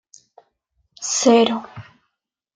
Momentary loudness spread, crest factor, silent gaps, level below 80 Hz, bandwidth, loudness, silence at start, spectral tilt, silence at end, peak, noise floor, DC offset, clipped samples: 17 LU; 18 dB; none; -70 dBFS; 9.6 kHz; -18 LUFS; 1 s; -3 dB/octave; 0.75 s; -4 dBFS; -77 dBFS; under 0.1%; under 0.1%